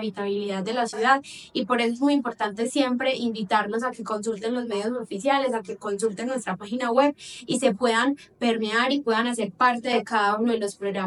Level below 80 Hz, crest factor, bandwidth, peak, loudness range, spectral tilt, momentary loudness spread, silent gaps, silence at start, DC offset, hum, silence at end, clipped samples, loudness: -70 dBFS; 18 dB; 12 kHz; -6 dBFS; 3 LU; -4 dB/octave; 7 LU; none; 0 s; under 0.1%; none; 0 s; under 0.1%; -25 LUFS